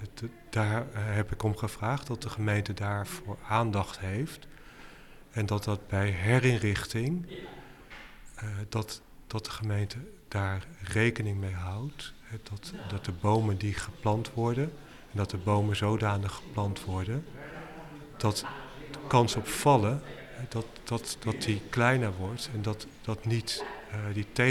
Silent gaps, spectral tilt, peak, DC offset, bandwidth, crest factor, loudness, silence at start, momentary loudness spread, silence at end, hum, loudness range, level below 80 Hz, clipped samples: none; -5.5 dB/octave; -10 dBFS; under 0.1%; 14.5 kHz; 22 dB; -31 LUFS; 0 s; 17 LU; 0 s; none; 4 LU; -52 dBFS; under 0.1%